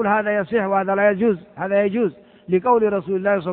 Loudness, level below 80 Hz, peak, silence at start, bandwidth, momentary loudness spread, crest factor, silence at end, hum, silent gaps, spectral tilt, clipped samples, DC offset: -20 LUFS; -60 dBFS; -4 dBFS; 0 s; 4.2 kHz; 6 LU; 16 dB; 0 s; none; none; -11 dB/octave; under 0.1%; under 0.1%